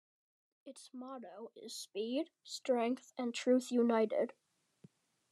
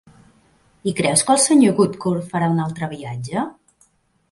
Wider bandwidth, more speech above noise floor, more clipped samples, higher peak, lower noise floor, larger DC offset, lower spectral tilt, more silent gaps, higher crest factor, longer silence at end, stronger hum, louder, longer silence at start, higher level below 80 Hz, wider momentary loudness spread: first, 13 kHz vs 11.5 kHz; second, 29 dB vs 42 dB; neither; second, -20 dBFS vs 0 dBFS; first, -66 dBFS vs -60 dBFS; neither; about the same, -4 dB/octave vs -4.5 dB/octave; neither; about the same, 18 dB vs 20 dB; first, 1.05 s vs 0.8 s; neither; second, -36 LUFS vs -18 LUFS; second, 0.65 s vs 0.85 s; second, under -90 dBFS vs -58 dBFS; first, 19 LU vs 14 LU